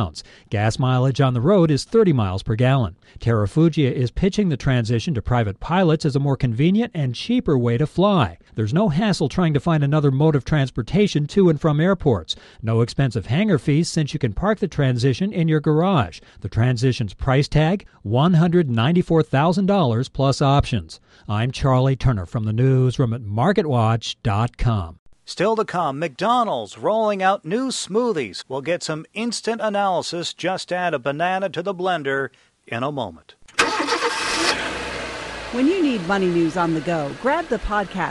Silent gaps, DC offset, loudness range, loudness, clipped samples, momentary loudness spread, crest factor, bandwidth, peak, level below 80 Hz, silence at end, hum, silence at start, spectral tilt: 24.99-25.06 s; under 0.1%; 4 LU; -20 LUFS; under 0.1%; 8 LU; 14 dB; 11.5 kHz; -6 dBFS; -40 dBFS; 0 s; none; 0 s; -6.5 dB/octave